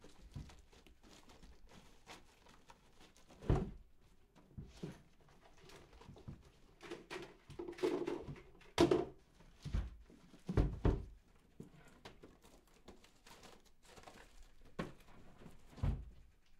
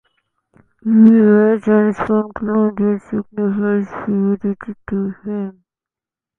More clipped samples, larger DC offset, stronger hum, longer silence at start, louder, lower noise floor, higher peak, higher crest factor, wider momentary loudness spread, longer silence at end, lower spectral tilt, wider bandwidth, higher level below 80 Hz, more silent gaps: neither; neither; neither; second, 0 s vs 0.85 s; second, -42 LUFS vs -16 LUFS; second, -65 dBFS vs -89 dBFS; second, -16 dBFS vs 0 dBFS; first, 28 dB vs 16 dB; first, 25 LU vs 15 LU; second, 0.4 s vs 0.9 s; second, -6.5 dB/octave vs -10.5 dB/octave; first, 15 kHz vs 3.2 kHz; about the same, -52 dBFS vs -54 dBFS; neither